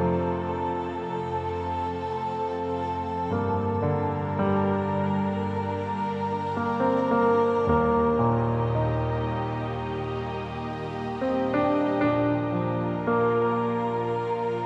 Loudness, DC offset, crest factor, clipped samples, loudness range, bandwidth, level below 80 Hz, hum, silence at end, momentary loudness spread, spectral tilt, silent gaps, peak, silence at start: -26 LUFS; under 0.1%; 14 dB; under 0.1%; 4 LU; 8 kHz; -48 dBFS; none; 0 s; 8 LU; -9 dB/octave; none; -12 dBFS; 0 s